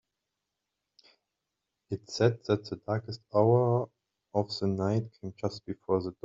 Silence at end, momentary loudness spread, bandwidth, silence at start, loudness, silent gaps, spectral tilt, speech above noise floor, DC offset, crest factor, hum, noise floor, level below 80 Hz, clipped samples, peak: 0.15 s; 15 LU; 7.6 kHz; 1.9 s; -30 LUFS; none; -7.5 dB/octave; 57 dB; under 0.1%; 22 dB; none; -86 dBFS; -68 dBFS; under 0.1%; -10 dBFS